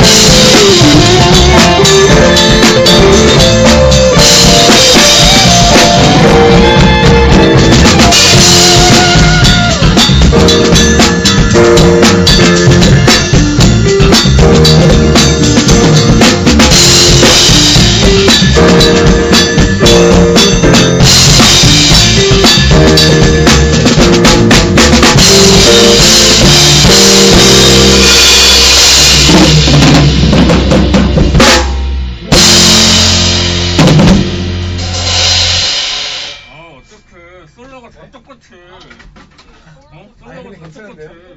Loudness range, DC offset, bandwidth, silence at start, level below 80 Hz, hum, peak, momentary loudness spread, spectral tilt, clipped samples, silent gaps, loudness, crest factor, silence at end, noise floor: 4 LU; under 0.1%; over 20 kHz; 0 s; -16 dBFS; none; 0 dBFS; 5 LU; -3.5 dB/octave; 5%; none; -4 LUFS; 6 dB; 0.3 s; -39 dBFS